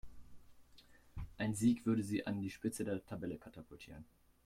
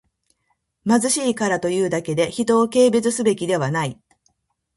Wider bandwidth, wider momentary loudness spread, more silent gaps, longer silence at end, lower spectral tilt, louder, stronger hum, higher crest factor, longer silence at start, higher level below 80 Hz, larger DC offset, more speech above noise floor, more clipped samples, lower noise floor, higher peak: first, 15.5 kHz vs 11.5 kHz; first, 21 LU vs 7 LU; neither; second, 0.4 s vs 0.85 s; first, -6 dB/octave vs -4.5 dB/octave; second, -39 LUFS vs -20 LUFS; neither; about the same, 20 dB vs 18 dB; second, 0.05 s vs 0.85 s; about the same, -60 dBFS vs -60 dBFS; neither; second, 25 dB vs 52 dB; neither; second, -64 dBFS vs -71 dBFS; second, -22 dBFS vs -4 dBFS